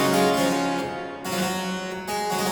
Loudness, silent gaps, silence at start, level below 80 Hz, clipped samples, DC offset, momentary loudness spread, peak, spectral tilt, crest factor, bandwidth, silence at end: -25 LUFS; none; 0 s; -58 dBFS; under 0.1%; under 0.1%; 10 LU; -8 dBFS; -4 dB/octave; 16 dB; over 20 kHz; 0 s